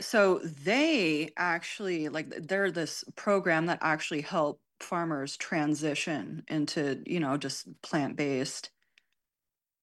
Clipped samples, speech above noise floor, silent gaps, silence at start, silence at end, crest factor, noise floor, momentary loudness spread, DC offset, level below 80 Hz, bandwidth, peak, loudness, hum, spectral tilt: under 0.1%; over 60 dB; none; 0 s; 1.15 s; 18 dB; under -90 dBFS; 10 LU; under 0.1%; -80 dBFS; 12.5 kHz; -14 dBFS; -30 LUFS; none; -4.5 dB/octave